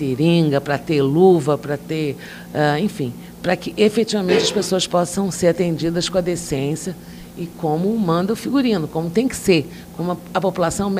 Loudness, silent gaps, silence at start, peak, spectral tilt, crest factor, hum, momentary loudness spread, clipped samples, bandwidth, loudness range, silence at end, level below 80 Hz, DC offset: -19 LUFS; none; 0 s; -2 dBFS; -5.5 dB/octave; 16 dB; none; 11 LU; under 0.1%; 16 kHz; 2 LU; 0 s; -48 dBFS; under 0.1%